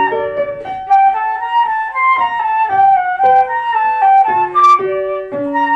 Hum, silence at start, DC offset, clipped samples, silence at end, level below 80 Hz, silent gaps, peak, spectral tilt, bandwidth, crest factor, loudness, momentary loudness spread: none; 0 s; under 0.1%; under 0.1%; 0 s; -54 dBFS; none; -2 dBFS; -4.5 dB/octave; 7.4 kHz; 10 dB; -13 LUFS; 9 LU